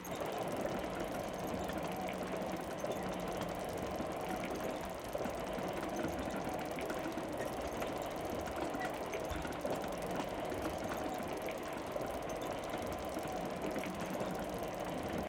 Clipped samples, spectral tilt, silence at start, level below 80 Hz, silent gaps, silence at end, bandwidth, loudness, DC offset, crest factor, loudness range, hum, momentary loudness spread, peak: under 0.1%; -5 dB/octave; 0 s; -56 dBFS; none; 0 s; 17 kHz; -40 LUFS; under 0.1%; 14 dB; 1 LU; none; 2 LU; -26 dBFS